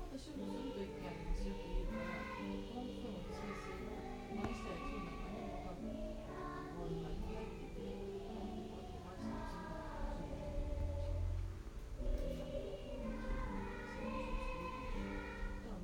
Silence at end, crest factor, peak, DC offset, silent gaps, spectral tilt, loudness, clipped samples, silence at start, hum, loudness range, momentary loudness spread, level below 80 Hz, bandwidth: 0 s; 16 dB; -28 dBFS; under 0.1%; none; -6.5 dB/octave; -46 LUFS; under 0.1%; 0 s; none; 2 LU; 4 LU; -48 dBFS; 16 kHz